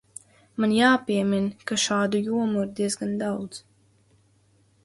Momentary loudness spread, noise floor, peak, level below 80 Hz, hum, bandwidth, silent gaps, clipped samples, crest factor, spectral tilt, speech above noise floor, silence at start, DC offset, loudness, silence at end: 19 LU; -62 dBFS; -8 dBFS; -66 dBFS; none; 11.5 kHz; none; under 0.1%; 18 dB; -4 dB/octave; 38 dB; 0.6 s; under 0.1%; -24 LUFS; 1.25 s